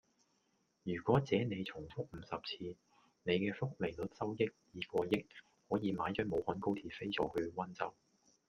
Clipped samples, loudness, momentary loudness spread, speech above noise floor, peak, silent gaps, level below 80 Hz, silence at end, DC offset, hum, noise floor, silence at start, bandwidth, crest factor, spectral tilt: under 0.1%; -39 LUFS; 11 LU; 40 dB; -16 dBFS; none; -68 dBFS; 0.55 s; under 0.1%; none; -79 dBFS; 0.85 s; 13 kHz; 22 dB; -7 dB/octave